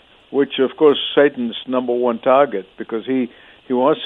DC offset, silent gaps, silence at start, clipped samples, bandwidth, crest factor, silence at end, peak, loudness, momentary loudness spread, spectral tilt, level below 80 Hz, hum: under 0.1%; none; 0.3 s; under 0.1%; 4 kHz; 16 dB; 0 s; -2 dBFS; -18 LUFS; 11 LU; -8 dB/octave; -64 dBFS; none